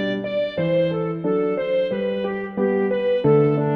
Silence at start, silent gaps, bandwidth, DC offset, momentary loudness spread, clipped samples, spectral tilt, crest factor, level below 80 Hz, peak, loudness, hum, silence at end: 0 s; none; 5.6 kHz; under 0.1%; 7 LU; under 0.1%; -9.5 dB/octave; 14 dB; -56 dBFS; -6 dBFS; -21 LUFS; none; 0 s